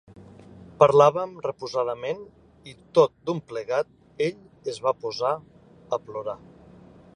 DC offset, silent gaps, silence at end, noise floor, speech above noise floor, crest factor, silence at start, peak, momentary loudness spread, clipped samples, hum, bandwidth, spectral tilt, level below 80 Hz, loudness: under 0.1%; none; 0.8 s; -50 dBFS; 26 dB; 24 dB; 0.5 s; -2 dBFS; 16 LU; under 0.1%; none; 10.5 kHz; -6 dB/octave; -62 dBFS; -25 LUFS